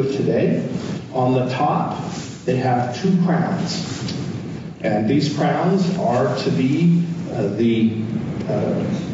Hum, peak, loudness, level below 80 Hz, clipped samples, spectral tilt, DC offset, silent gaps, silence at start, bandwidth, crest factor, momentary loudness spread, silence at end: none; -8 dBFS; -20 LUFS; -54 dBFS; under 0.1%; -7 dB/octave; under 0.1%; none; 0 s; 7.8 kHz; 12 dB; 8 LU; 0 s